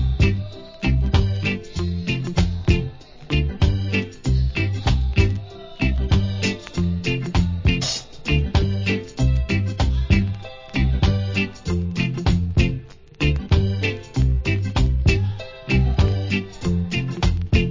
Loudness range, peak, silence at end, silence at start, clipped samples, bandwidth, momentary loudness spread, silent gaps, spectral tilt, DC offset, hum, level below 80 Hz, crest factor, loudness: 1 LU; -2 dBFS; 0 s; 0 s; under 0.1%; 7.6 kHz; 6 LU; none; -6 dB/octave; under 0.1%; none; -24 dBFS; 18 dB; -22 LUFS